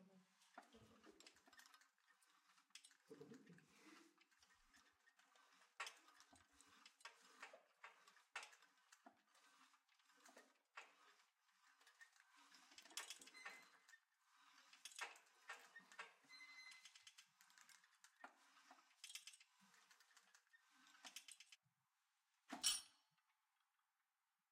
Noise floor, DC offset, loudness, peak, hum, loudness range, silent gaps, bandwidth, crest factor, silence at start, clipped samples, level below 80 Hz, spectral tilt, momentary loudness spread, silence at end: under -90 dBFS; under 0.1%; -55 LUFS; -28 dBFS; none; 17 LU; none; 14.5 kHz; 34 dB; 0 s; under 0.1%; under -90 dBFS; 0.5 dB/octave; 14 LU; 1.5 s